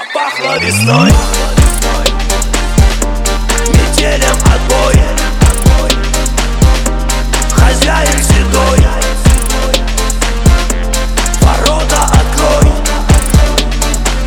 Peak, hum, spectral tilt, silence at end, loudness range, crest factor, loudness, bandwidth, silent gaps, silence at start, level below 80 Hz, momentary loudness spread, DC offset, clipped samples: 0 dBFS; none; -4 dB/octave; 0 s; 1 LU; 8 dB; -11 LUFS; 19 kHz; none; 0 s; -12 dBFS; 5 LU; under 0.1%; 0.5%